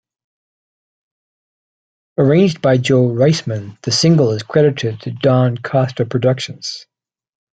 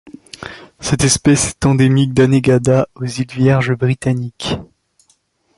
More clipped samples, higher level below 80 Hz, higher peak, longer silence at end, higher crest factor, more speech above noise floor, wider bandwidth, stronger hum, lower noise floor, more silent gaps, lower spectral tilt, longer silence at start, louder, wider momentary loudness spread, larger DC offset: neither; second, -54 dBFS vs -40 dBFS; about the same, 0 dBFS vs 0 dBFS; second, 0.8 s vs 0.95 s; about the same, 16 dB vs 14 dB; first, over 75 dB vs 45 dB; second, 9 kHz vs 11.5 kHz; neither; first, under -90 dBFS vs -59 dBFS; neither; about the same, -6 dB/octave vs -5.5 dB/octave; first, 2.2 s vs 0.05 s; about the same, -15 LUFS vs -15 LUFS; about the same, 12 LU vs 13 LU; neither